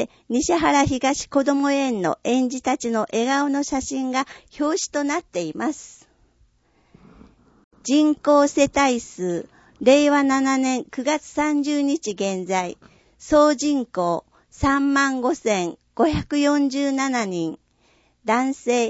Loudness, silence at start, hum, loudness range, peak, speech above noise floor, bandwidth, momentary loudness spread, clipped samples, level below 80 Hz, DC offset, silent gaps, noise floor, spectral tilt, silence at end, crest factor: -21 LUFS; 0 s; none; 7 LU; -4 dBFS; 41 dB; 8 kHz; 9 LU; under 0.1%; -48 dBFS; under 0.1%; 7.64-7.71 s; -61 dBFS; -4 dB/octave; 0 s; 18 dB